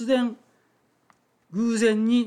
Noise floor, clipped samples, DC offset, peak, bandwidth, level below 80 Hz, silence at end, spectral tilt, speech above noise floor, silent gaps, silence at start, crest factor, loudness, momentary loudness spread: -66 dBFS; under 0.1%; under 0.1%; -10 dBFS; 11 kHz; -74 dBFS; 0 s; -5 dB/octave; 45 dB; none; 0 s; 14 dB; -24 LUFS; 13 LU